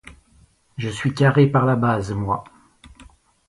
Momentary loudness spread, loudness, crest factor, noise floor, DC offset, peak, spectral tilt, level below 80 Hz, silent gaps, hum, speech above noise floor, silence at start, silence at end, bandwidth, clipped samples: 13 LU; -20 LUFS; 18 dB; -56 dBFS; under 0.1%; -4 dBFS; -7.5 dB/octave; -48 dBFS; none; none; 37 dB; 0.05 s; 0.45 s; 11.5 kHz; under 0.1%